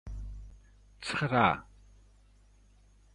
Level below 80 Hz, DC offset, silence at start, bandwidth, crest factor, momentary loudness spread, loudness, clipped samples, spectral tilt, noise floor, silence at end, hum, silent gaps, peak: -50 dBFS; under 0.1%; 0.05 s; 11 kHz; 24 dB; 21 LU; -30 LUFS; under 0.1%; -5.5 dB/octave; -61 dBFS; 1.5 s; 50 Hz at -55 dBFS; none; -10 dBFS